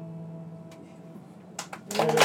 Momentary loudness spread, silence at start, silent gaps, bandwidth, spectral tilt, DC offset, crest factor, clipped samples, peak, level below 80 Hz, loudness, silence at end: 19 LU; 0 s; none; 17 kHz; -3.5 dB/octave; under 0.1%; 26 dB; under 0.1%; -4 dBFS; -80 dBFS; -33 LUFS; 0 s